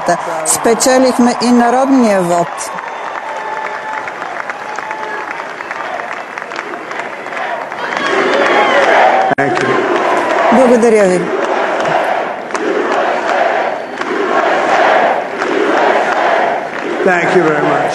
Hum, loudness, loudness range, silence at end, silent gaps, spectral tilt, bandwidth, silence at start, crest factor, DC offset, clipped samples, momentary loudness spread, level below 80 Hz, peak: none; -13 LUFS; 10 LU; 0 s; none; -3.5 dB/octave; 13 kHz; 0 s; 12 dB; under 0.1%; under 0.1%; 13 LU; -56 dBFS; 0 dBFS